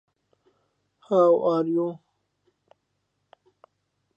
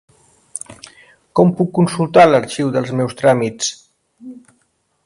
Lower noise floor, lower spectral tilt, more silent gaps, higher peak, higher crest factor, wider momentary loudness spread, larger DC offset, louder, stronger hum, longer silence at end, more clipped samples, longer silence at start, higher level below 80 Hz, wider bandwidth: first, -76 dBFS vs -64 dBFS; first, -9 dB/octave vs -5.5 dB/octave; neither; second, -8 dBFS vs 0 dBFS; about the same, 20 dB vs 18 dB; second, 12 LU vs 20 LU; neither; second, -22 LUFS vs -15 LUFS; neither; first, 2.2 s vs 0.7 s; neither; first, 1.1 s vs 0.55 s; second, -82 dBFS vs -56 dBFS; second, 7 kHz vs 11.5 kHz